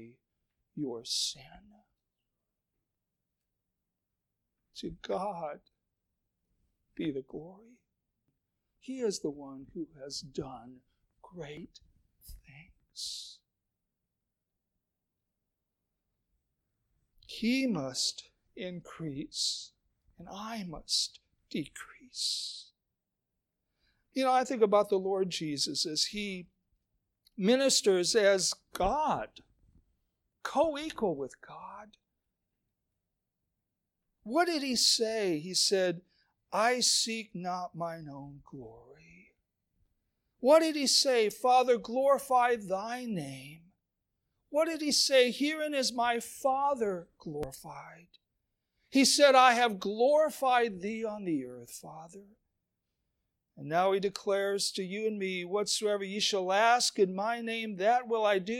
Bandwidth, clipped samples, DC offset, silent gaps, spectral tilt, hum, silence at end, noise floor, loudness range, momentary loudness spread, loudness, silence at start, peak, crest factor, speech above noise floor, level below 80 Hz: 17 kHz; under 0.1%; under 0.1%; none; -2.5 dB/octave; none; 0 s; -87 dBFS; 17 LU; 21 LU; -29 LUFS; 0 s; -10 dBFS; 22 dB; 57 dB; -64 dBFS